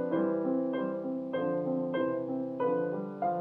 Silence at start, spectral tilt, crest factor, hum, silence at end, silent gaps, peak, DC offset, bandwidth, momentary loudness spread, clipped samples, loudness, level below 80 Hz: 0 s; -10 dB/octave; 12 dB; none; 0 s; none; -18 dBFS; under 0.1%; 4 kHz; 5 LU; under 0.1%; -32 LUFS; -80 dBFS